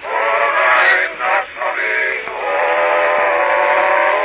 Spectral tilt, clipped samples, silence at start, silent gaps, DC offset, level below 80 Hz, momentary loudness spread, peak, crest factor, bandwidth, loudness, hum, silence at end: -4.5 dB/octave; under 0.1%; 0 s; none; under 0.1%; -58 dBFS; 7 LU; 0 dBFS; 14 dB; 4 kHz; -14 LUFS; none; 0 s